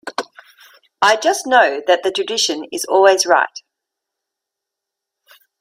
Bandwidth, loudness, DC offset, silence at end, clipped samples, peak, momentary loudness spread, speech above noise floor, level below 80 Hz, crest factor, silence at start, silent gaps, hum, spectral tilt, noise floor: 16 kHz; -15 LUFS; under 0.1%; 2 s; under 0.1%; 0 dBFS; 11 LU; 67 dB; -70 dBFS; 18 dB; 0.05 s; none; none; -0.5 dB/octave; -82 dBFS